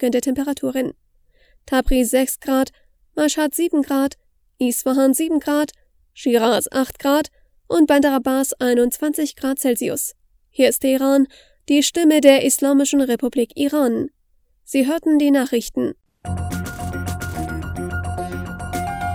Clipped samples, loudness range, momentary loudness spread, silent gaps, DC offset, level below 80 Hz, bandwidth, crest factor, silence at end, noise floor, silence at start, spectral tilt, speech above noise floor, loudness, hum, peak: under 0.1%; 5 LU; 12 LU; none; under 0.1%; -40 dBFS; 19.5 kHz; 20 dB; 0 s; -61 dBFS; 0 s; -4 dB/octave; 43 dB; -19 LUFS; none; 0 dBFS